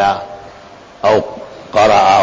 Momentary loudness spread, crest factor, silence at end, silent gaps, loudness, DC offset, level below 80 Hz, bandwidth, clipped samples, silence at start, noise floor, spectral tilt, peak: 22 LU; 12 dB; 0 s; none; -13 LUFS; under 0.1%; -46 dBFS; 8 kHz; under 0.1%; 0 s; -37 dBFS; -4 dB/octave; -2 dBFS